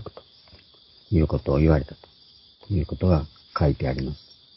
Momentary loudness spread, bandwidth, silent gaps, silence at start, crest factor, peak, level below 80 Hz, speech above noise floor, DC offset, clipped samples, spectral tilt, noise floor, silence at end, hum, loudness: 13 LU; 5.8 kHz; none; 0 s; 20 dB; -4 dBFS; -32 dBFS; 32 dB; under 0.1%; under 0.1%; -12 dB/octave; -54 dBFS; 0.4 s; none; -24 LUFS